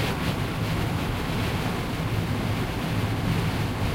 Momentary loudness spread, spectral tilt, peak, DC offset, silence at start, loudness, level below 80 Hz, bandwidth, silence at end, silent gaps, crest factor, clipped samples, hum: 2 LU; -6 dB/octave; -14 dBFS; under 0.1%; 0 s; -27 LUFS; -36 dBFS; 16 kHz; 0 s; none; 12 dB; under 0.1%; none